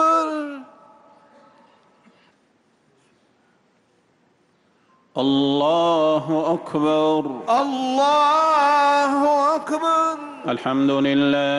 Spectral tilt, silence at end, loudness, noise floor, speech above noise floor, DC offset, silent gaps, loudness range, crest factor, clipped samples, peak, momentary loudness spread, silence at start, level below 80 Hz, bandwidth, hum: -5 dB/octave; 0 s; -19 LUFS; -62 dBFS; 43 dB; under 0.1%; none; 9 LU; 12 dB; under 0.1%; -8 dBFS; 9 LU; 0 s; -66 dBFS; 11.5 kHz; none